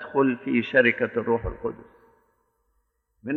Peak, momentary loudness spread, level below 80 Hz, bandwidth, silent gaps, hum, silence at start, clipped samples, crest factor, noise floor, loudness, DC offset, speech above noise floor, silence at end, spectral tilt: -6 dBFS; 16 LU; -46 dBFS; 4.3 kHz; none; none; 0 s; under 0.1%; 20 dB; -72 dBFS; -24 LUFS; under 0.1%; 48 dB; 0 s; -8.5 dB/octave